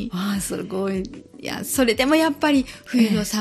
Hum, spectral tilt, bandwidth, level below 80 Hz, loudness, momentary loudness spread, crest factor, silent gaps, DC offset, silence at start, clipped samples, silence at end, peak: none; -4.5 dB/octave; 15 kHz; -46 dBFS; -21 LUFS; 11 LU; 18 dB; none; under 0.1%; 0 s; under 0.1%; 0 s; -4 dBFS